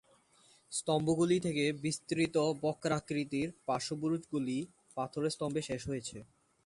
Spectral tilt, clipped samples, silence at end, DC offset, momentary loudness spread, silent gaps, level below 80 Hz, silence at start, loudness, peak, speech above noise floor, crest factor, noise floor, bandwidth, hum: -5 dB/octave; under 0.1%; 0.4 s; under 0.1%; 9 LU; none; -66 dBFS; 0.7 s; -35 LUFS; -18 dBFS; 32 dB; 18 dB; -66 dBFS; 11.5 kHz; none